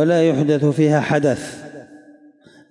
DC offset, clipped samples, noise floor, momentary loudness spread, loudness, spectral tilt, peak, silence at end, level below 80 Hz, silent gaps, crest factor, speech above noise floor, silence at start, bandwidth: under 0.1%; under 0.1%; -48 dBFS; 18 LU; -17 LUFS; -7 dB/octave; -4 dBFS; 0.75 s; -62 dBFS; none; 14 dB; 32 dB; 0 s; 11.5 kHz